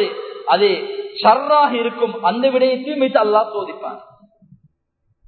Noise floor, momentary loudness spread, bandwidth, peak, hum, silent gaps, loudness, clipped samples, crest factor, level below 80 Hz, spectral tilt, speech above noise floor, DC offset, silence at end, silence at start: -67 dBFS; 13 LU; 4.6 kHz; 0 dBFS; none; none; -17 LUFS; under 0.1%; 18 dB; -74 dBFS; -9.5 dB/octave; 51 dB; under 0.1%; 1.25 s; 0 s